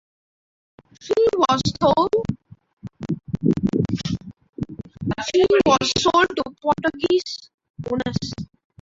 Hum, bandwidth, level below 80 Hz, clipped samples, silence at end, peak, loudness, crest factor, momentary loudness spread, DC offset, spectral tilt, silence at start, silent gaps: none; 8 kHz; -48 dBFS; under 0.1%; 0.4 s; -4 dBFS; -21 LUFS; 18 dB; 18 LU; under 0.1%; -5 dB/octave; 1 s; 2.73-2.77 s, 4.49-4.53 s, 7.54-7.58 s, 7.70-7.74 s